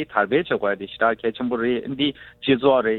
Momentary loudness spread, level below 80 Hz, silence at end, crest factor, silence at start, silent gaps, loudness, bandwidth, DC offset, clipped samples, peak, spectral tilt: 7 LU; -56 dBFS; 0 s; 18 dB; 0 s; none; -22 LUFS; 4.3 kHz; under 0.1%; under 0.1%; -4 dBFS; -8.5 dB/octave